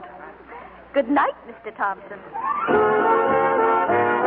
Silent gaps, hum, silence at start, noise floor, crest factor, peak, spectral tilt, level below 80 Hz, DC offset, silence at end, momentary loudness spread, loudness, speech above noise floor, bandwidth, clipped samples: none; none; 0 s; -41 dBFS; 14 dB; -8 dBFS; -10 dB/octave; -58 dBFS; under 0.1%; 0 s; 22 LU; -20 LUFS; 19 dB; 4.1 kHz; under 0.1%